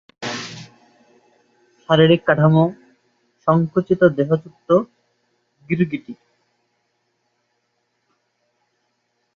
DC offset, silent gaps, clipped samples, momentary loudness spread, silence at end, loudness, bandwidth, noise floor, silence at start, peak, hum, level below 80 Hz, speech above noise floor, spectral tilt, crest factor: under 0.1%; none; under 0.1%; 19 LU; 3.2 s; -18 LUFS; 7.4 kHz; -70 dBFS; 0.2 s; -2 dBFS; none; -60 dBFS; 54 dB; -7.5 dB/octave; 20 dB